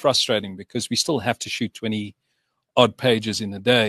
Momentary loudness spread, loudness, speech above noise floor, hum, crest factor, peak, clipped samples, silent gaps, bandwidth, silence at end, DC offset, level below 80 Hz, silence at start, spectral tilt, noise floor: 11 LU; -22 LUFS; 52 dB; none; 20 dB; -2 dBFS; under 0.1%; none; 13 kHz; 0 s; under 0.1%; -62 dBFS; 0 s; -3.5 dB/octave; -74 dBFS